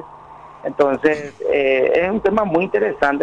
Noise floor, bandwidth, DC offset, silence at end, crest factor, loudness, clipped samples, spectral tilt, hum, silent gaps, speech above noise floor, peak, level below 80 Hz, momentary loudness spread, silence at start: -40 dBFS; 9.4 kHz; under 0.1%; 0 s; 14 dB; -18 LUFS; under 0.1%; -6.5 dB/octave; none; none; 23 dB; -4 dBFS; -48 dBFS; 6 LU; 0 s